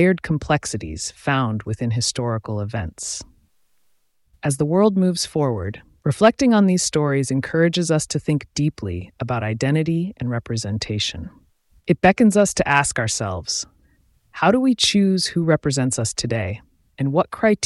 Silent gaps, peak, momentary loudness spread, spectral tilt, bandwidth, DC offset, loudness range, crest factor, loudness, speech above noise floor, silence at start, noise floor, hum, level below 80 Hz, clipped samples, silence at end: none; -2 dBFS; 12 LU; -5 dB/octave; 12 kHz; under 0.1%; 6 LU; 18 dB; -20 LUFS; 43 dB; 0 s; -62 dBFS; none; -46 dBFS; under 0.1%; 0 s